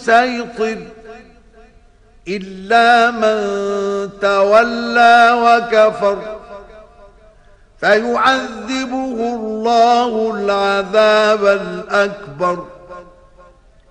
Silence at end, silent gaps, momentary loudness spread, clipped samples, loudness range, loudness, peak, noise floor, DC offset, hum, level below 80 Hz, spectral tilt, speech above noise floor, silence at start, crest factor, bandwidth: 0.9 s; none; 15 LU; under 0.1%; 5 LU; -14 LUFS; 0 dBFS; -47 dBFS; under 0.1%; none; -50 dBFS; -4 dB/octave; 33 dB; 0 s; 16 dB; 10 kHz